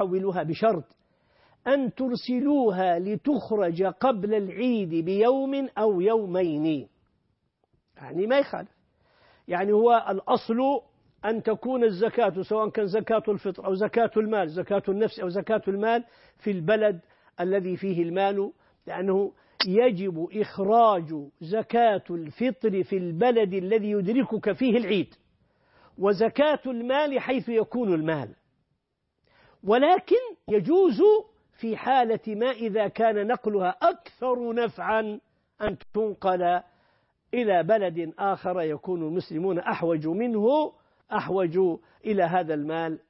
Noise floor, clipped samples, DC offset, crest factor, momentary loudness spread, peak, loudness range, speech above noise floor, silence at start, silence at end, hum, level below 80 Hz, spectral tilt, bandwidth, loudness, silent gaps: -78 dBFS; under 0.1%; under 0.1%; 16 dB; 9 LU; -10 dBFS; 3 LU; 53 dB; 0 s; 0.1 s; none; -66 dBFS; -10.5 dB/octave; 5.8 kHz; -25 LUFS; none